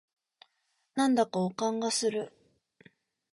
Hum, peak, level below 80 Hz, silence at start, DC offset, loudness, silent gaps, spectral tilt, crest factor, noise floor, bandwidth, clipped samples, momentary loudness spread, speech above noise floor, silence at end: none; -14 dBFS; -78 dBFS; 0.95 s; under 0.1%; -30 LUFS; none; -4 dB/octave; 20 dB; -77 dBFS; 11.5 kHz; under 0.1%; 11 LU; 48 dB; 1.05 s